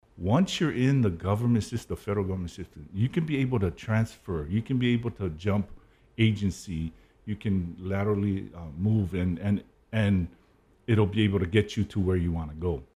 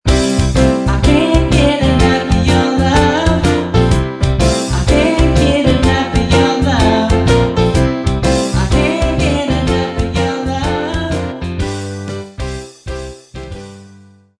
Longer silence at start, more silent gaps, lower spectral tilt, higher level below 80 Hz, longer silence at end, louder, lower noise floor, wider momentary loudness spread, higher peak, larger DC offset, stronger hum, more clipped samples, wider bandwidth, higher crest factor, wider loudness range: about the same, 0.15 s vs 0.05 s; neither; about the same, -7 dB/octave vs -6 dB/octave; second, -48 dBFS vs -20 dBFS; second, 0.15 s vs 0.5 s; second, -28 LUFS vs -13 LUFS; first, -62 dBFS vs -42 dBFS; second, 10 LU vs 13 LU; second, -8 dBFS vs 0 dBFS; neither; neither; neither; first, 13 kHz vs 11 kHz; first, 20 dB vs 12 dB; second, 3 LU vs 8 LU